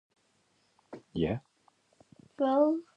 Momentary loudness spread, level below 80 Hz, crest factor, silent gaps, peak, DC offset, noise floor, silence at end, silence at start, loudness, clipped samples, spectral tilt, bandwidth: 23 LU; -60 dBFS; 20 dB; none; -14 dBFS; under 0.1%; -72 dBFS; 0.15 s; 0.9 s; -30 LUFS; under 0.1%; -8.5 dB/octave; 8.6 kHz